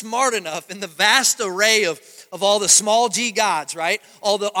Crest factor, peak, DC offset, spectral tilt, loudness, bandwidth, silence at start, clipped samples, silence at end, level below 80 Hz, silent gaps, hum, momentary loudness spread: 20 dB; 0 dBFS; under 0.1%; -0.5 dB/octave; -17 LUFS; 17 kHz; 0 s; under 0.1%; 0 s; -74 dBFS; none; none; 15 LU